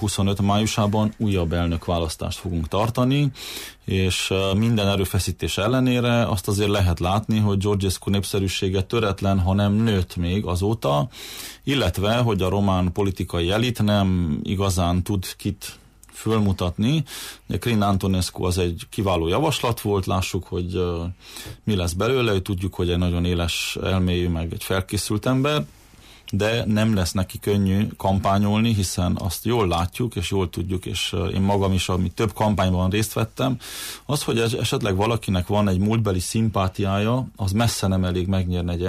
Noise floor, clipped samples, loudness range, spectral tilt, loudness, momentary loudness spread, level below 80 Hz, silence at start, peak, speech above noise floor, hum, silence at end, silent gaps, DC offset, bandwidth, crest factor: -48 dBFS; under 0.1%; 2 LU; -5.5 dB/octave; -22 LUFS; 6 LU; -40 dBFS; 0 s; -10 dBFS; 26 dB; none; 0 s; none; under 0.1%; 15.5 kHz; 12 dB